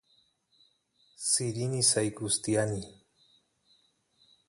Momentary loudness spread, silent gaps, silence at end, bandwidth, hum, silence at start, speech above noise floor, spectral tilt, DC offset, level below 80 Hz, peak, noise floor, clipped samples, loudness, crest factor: 11 LU; none; 1.55 s; 11.5 kHz; none; 1.2 s; 40 dB; -3.5 dB/octave; under 0.1%; -64 dBFS; -12 dBFS; -70 dBFS; under 0.1%; -28 LUFS; 22 dB